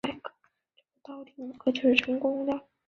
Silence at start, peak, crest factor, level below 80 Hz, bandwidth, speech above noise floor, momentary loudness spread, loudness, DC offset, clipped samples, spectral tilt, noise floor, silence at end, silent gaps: 0.05 s; -6 dBFS; 24 dB; -66 dBFS; 7.6 kHz; 43 dB; 22 LU; -27 LUFS; under 0.1%; under 0.1%; -4.5 dB/octave; -71 dBFS; 0.25 s; none